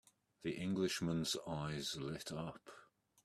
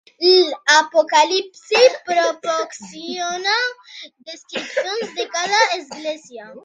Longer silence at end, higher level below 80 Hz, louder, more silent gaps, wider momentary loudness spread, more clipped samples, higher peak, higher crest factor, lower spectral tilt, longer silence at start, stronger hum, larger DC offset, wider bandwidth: first, 0.4 s vs 0.05 s; first, -70 dBFS vs -76 dBFS; second, -42 LUFS vs -17 LUFS; neither; second, 11 LU vs 18 LU; neither; second, -26 dBFS vs 0 dBFS; about the same, 18 dB vs 18 dB; first, -4.5 dB/octave vs -1 dB/octave; first, 0.4 s vs 0.2 s; neither; neither; first, 14 kHz vs 10 kHz